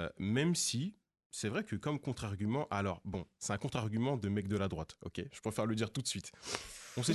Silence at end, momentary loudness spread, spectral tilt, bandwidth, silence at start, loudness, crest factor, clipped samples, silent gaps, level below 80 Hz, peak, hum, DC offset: 0 s; 10 LU; -4.5 dB/octave; 12 kHz; 0 s; -38 LUFS; 22 dB; under 0.1%; 1.25-1.30 s; -58 dBFS; -14 dBFS; none; under 0.1%